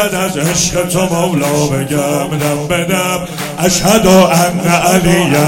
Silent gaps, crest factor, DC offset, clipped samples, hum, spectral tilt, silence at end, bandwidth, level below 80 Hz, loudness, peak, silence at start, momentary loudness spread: none; 12 dB; under 0.1%; 0.5%; none; -4.5 dB/octave; 0 s; 17.5 kHz; -36 dBFS; -12 LUFS; 0 dBFS; 0 s; 8 LU